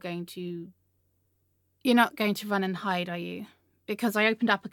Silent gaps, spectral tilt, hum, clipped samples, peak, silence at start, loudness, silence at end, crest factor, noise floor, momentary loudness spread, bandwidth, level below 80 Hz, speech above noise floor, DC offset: none; -5 dB/octave; none; under 0.1%; -8 dBFS; 0.05 s; -28 LUFS; 0.05 s; 22 dB; -72 dBFS; 17 LU; 17.5 kHz; -80 dBFS; 44 dB; under 0.1%